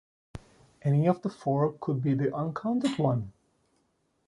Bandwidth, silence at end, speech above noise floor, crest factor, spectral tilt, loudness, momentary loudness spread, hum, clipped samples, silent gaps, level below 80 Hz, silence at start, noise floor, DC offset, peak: 11.5 kHz; 0.95 s; 46 dB; 18 dB; -8.5 dB/octave; -29 LUFS; 22 LU; none; under 0.1%; none; -60 dBFS; 0.35 s; -73 dBFS; under 0.1%; -10 dBFS